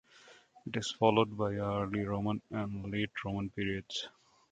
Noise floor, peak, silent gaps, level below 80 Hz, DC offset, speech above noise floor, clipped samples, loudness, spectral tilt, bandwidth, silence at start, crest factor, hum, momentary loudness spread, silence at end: -60 dBFS; -10 dBFS; none; -60 dBFS; under 0.1%; 26 dB; under 0.1%; -34 LUFS; -5.5 dB/octave; 9.4 kHz; 0.25 s; 24 dB; none; 11 LU; 0.4 s